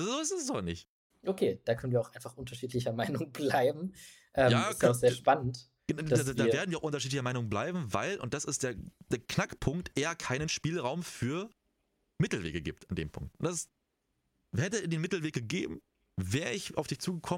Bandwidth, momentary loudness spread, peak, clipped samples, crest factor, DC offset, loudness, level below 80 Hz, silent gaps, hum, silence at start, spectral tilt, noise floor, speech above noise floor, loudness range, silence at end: 16.5 kHz; 12 LU; -12 dBFS; under 0.1%; 22 dB; under 0.1%; -33 LUFS; -58 dBFS; 0.89-1.10 s; none; 0 s; -5 dB/octave; -81 dBFS; 48 dB; 7 LU; 0 s